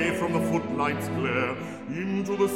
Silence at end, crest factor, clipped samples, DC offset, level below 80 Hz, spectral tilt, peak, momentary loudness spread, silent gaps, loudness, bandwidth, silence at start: 0 s; 16 dB; under 0.1%; 0.1%; -60 dBFS; -6 dB/octave; -12 dBFS; 7 LU; none; -28 LUFS; 17 kHz; 0 s